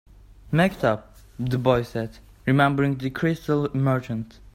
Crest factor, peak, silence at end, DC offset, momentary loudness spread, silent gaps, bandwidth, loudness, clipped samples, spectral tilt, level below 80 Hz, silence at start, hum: 18 dB; -6 dBFS; 0.3 s; under 0.1%; 12 LU; none; 15.5 kHz; -24 LUFS; under 0.1%; -7.5 dB/octave; -48 dBFS; 0.3 s; none